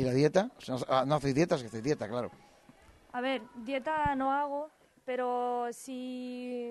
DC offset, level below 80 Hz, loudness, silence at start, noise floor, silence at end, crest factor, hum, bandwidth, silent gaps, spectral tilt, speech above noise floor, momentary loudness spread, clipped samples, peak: under 0.1%; -60 dBFS; -32 LUFS; 0 s; -59 dBFS; 0 s; 20 dB; none; 12 kHz; none; -6 dB/octave; 27 dB; 11 LU; under 0.1%; -14 dBFS